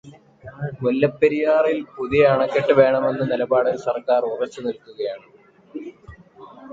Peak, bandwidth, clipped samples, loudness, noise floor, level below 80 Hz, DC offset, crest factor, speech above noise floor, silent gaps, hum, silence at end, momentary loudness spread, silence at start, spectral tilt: -4 dBFS; 7.6 kHz; under 0.1%; -20 LUFS; -45 dBFS; -54 dBFS; under 0.1%; 18 dB; 26 dB; none; none; 0 s; 19 LU; 0.05 s; -7.5 dB/octave